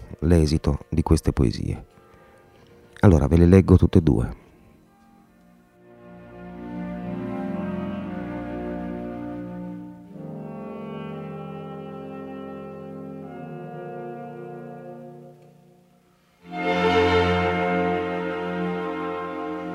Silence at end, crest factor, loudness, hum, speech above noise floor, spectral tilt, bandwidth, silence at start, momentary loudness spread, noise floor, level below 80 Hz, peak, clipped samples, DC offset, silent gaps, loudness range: 0 s; 24 dB; -23 LUFS; none; 41 dB; -7.5 dB/octave; 12 kHz; 0 s; 20 LU; -59 dBFS; -36 dBFS; -2 dBFS; under 0.1%; under 0.1%; none; 17 LU